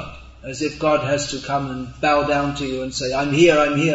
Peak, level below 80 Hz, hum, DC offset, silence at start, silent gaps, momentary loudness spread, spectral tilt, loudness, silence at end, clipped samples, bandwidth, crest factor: -2 dBFS; -44 dBFS; none; under 0.1%; 0 s; none; 13 LU; -5 dB/octave; -20 LUFS; 0 s; under 0.1%; 8 kHz; 18 dB